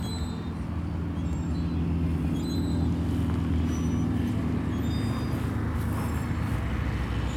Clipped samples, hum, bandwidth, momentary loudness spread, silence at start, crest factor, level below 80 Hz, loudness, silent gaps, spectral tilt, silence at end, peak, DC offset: under 0.1%; none; 15.5 kHz; 4 LU; 0 s; 12 dB; -34 dBFS; -29 LUFS; none; -7.5 dB/octave; 0 s; -16 dBFS; under 0.1%